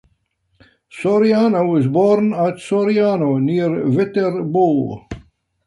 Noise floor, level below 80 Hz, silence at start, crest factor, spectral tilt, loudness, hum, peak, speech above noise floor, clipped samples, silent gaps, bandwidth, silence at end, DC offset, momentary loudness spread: -65 dBFS; -52 dBFS; 0.95 s; 14 dB; -8.5 dB/octave; -17 LUFS; none; -2 dBFS; 49 dB; under 0.1%; none; 11 kHz; 0.5 s; under 0.1%; 8 LU